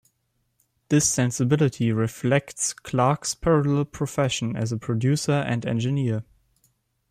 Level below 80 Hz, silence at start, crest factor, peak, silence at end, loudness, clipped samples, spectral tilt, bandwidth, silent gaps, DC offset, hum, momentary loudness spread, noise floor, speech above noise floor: -52 dBFS; 0.9 s; 16 dB; -8 dBFS; 0.9 s; -24 LUFS; under 0.1%; -5 dB/octave; 15 kHz; none; under 0.1%; none; 6 LU; -72 dBFS; 50 dB